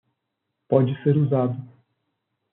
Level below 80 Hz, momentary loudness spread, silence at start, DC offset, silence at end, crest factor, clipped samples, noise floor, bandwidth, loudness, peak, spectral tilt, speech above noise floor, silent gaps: -68 dBFS; 7 LU; 0.7 s; under 0.1%; 0.85 s; 20 dB; under 0.1%; -79 dBFS; 3.9 kHz; -22 LUFS; -4 dBFS; -9.5 dB/octave; 59 dB; none